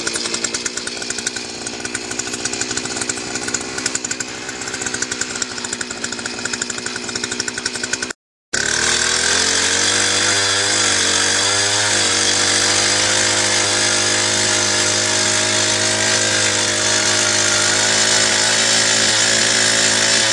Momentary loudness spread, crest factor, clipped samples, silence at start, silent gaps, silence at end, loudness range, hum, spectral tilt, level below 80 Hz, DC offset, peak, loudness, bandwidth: 11 LU; 16 dB; under 0.1%; 0 s; 8.15-8.52 s; 0 s; 9 LU; none; -0.5 dB/octave; -52 dBFS; under 0.1%; 0 dBFS; -15 LUFS; 12 kHz